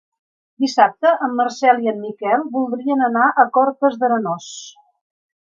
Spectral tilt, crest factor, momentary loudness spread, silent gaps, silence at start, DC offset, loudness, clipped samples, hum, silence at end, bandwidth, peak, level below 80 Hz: -4.5 dB/octave; 18 dB; 10 LU; none; 0.6 s; under 0.1%; -17 LUFS; under 0.1%; none; 0.85 s; 7.6 kHz; 0 dBFS; -76 dBFS